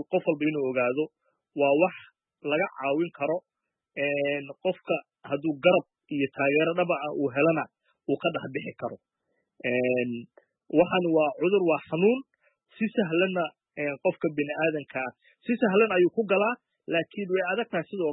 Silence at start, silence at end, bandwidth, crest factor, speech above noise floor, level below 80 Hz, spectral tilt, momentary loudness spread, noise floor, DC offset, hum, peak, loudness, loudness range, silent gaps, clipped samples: 0 s; 0 s; 4 kHz; 18 dB; 52 dB; -74 dBFS; -10 dB/octave; 11 LU; -78 dBFS; under 0.1%; none; -8 dBFS; -27 LUFS; 3 LU; none; under 0.1%